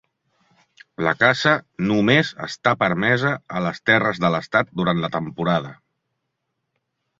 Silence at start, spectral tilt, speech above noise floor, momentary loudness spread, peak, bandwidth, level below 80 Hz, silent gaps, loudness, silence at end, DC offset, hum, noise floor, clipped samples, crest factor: 1 s; -6 dB/octave; 57 dB; 8 LU; -2 dBFS; 7.8 kHz; -56 dBFS; none; -20 LUFS; 1.45 s; under 0.1%; none; -77 dBFS; under 0.1%; 20 dB